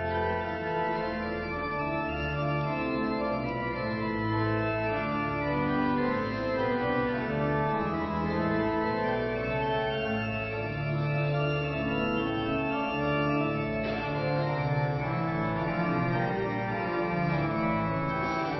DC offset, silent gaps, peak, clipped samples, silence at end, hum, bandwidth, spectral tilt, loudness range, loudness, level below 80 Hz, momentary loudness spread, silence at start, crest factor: under 0.1%; none; -16 dBFS; under 0.1%; 0 s; none; 6 kHz; -8.5 dB/octave; 1 LU; -29 LUFS; -48 dBFS; 3 LU; 0 s; 14 dB